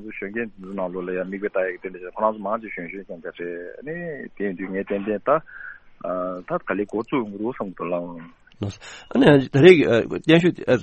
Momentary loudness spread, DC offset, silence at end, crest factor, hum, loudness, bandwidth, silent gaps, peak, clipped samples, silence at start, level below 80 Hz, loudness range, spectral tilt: 18 LU; under 0.1%; 0 s; 22 dB; none; -22 LUFS; 8.4 kHz; none; 0 dBFS; under 0.1%; 0 s; -54 dBFS; 10 LU; -7 dB/octave